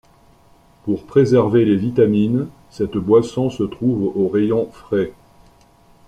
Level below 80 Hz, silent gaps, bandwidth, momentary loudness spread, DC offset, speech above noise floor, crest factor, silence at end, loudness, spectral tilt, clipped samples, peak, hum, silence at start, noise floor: -50 dBFS; none; 10.5 kHz; 11 LU; under 0.1%; 34 dB; 16 dB; 0.95 s; -18 LUFS; -8.5 dB/octave; under 0.1%; -2 dBFS; none; 0.85 s; -51 dBFS